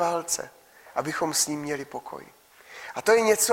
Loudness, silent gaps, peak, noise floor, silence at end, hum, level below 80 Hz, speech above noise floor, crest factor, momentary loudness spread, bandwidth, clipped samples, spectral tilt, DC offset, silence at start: -25 LUFS; none; -6 dBFS; -46 dBFS; 0 s; none; -66 dBFS; 21 dB; 20 dB; 21 LU; 16.5 kHz; under 0.1%; -2 dB/octave; under 0.1%; 0 s